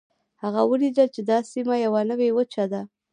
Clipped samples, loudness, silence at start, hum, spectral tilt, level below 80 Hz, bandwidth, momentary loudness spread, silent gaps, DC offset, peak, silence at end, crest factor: under 0.1%; -23 LUFS; 0.45 s; none; -6.5 dB/octave; -78 dBFS; 10 kHz; 7 LU; none; under 0.1%; -6 dBFS; 0.25 s; 16 dB